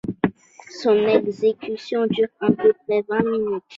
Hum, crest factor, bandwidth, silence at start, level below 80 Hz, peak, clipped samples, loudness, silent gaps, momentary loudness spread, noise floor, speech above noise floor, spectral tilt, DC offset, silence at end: none; 18 dB; 7.6 kHz; 0.05 s; -58 dBFS; -4 dBFS; under 0.1%; -21 LUFS; none; 8 LU; -43 dBFS; 23 dB; -7 dB/octave; under 0.1%; 0 s